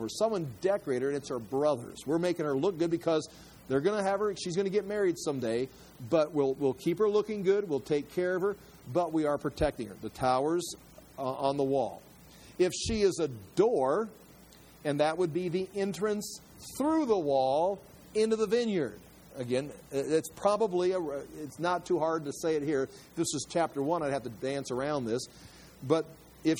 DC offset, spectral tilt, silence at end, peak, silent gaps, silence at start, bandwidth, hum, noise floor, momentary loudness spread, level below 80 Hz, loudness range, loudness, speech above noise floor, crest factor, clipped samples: under 0.1%; -5.5 dB/octave; 0 s; -12 dBFS; none; 0 s; over 20 kHz; none; -55 dBFS; 10 LU; -58 dBFS; 2 LU; -31 LUFS; 25 dB; 18 dB; under 0.1%